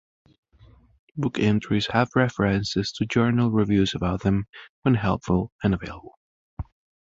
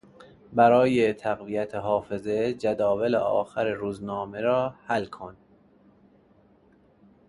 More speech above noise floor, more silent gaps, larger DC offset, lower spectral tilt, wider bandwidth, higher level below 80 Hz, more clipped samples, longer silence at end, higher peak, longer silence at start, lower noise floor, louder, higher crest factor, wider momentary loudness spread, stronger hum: second, 31 dB vs 35 dB; first, 4.49-4.53 s, 4.69-4.82 s, 5.52-5.59 s, 6.17-6.57 s vs none; neither; about the same, -6.5 dB/octave vs -7 dB/octave; second, 7.8 kHz vs 11.5 kHz; first, -44 dBFS vs -60 dBFS; neither; second, 0.4 s vs 1.95 s; first, -4 dBFS vs -8 dBFS; first, 1.15 s vs 0.2 s; second, -54 dBFS vs -59 dBFS; about the same, -24 LUFS vs -25 LUFS; about the same, 20 dB vs 18 dB; first, 18 LU vs 12 LU; neither